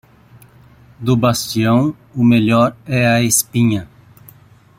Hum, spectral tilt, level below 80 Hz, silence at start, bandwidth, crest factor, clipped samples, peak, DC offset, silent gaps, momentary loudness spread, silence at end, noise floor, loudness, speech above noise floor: none; -5 dB/octave; -50 dBFS; 1 s; 16 kHz; 16 dB; under 0.1%; -2 dBFS; under 0.1%; none; 6 LU; 0.95 s; -46 dBFS; -15 LUFS; 31 dB